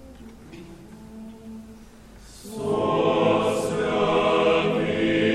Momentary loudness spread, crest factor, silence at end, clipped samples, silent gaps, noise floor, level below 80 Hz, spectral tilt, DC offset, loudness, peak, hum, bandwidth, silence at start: 23 LU; 16 dB; 0 s; under 0.1%; none; -46 dBFS; -50 dBFS; -5.5 dB/octave; under 0.1%; -22 LUFS; -8 dBFS; none; 14.5 kHz; 0 s